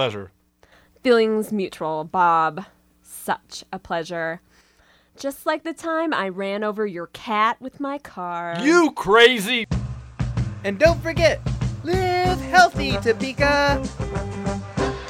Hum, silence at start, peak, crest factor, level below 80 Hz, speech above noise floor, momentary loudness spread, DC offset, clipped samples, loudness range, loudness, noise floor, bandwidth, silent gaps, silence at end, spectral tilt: none; 0 s; -2 dBFS; 20 dB; -38 dBFS; 37 dB; 13 LU; under 0.1%; under 0.1%; 8 LU; -21 LUFS; -57 dBFS; 16.5 kHz; none; 0 s; -5 dB/octave